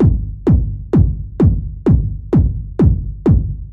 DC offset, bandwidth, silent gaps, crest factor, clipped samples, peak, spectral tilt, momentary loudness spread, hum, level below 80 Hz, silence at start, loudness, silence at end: under 0.1%; 4.2 kHz; none; 14 dB; under 0.1%; 0 dBFS; -12 dB/octave; 3 LU; none; -20 dBFS; 0 s; -16 LUFS; 0 s